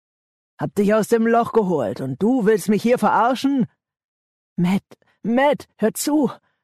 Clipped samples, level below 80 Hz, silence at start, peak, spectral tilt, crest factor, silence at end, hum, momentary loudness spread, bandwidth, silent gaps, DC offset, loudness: under 0.1%; -62 dBFS; 0.6 s; -8 dBFS; -6 dB/octave; 12 dB; 0.3 s; none; 8 LU; 13.5 kHz; 4.04-4.56 s; under 0.1%; -20 LUFS